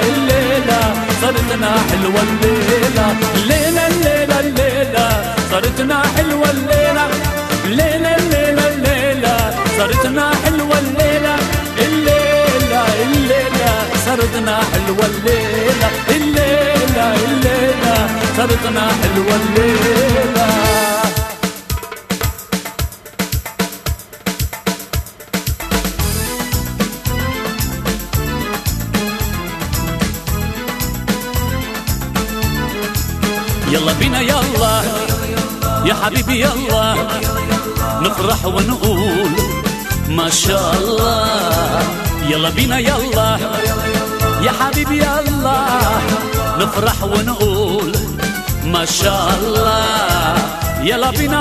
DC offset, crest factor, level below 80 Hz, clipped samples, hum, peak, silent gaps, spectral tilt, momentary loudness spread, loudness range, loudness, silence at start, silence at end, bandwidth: under 0.1%; 14 dB; -26 dBFS; under 0.1%; none; 0 dBFS; none; -4.5 dB/octave; 7 LU; 6 LU; -15 LUFS; 0 s; 0 s; 14 kHz